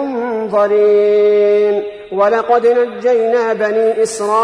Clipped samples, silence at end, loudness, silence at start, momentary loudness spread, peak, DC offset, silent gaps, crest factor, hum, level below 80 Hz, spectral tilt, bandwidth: under 0.1%; 0 s; -13 LUFS; 0 s; 6 LU; -2 dBFS; under 0.1%; none; 12 dB; none; -58 dBFS; -4.5 dB/octave; 10.5 kHz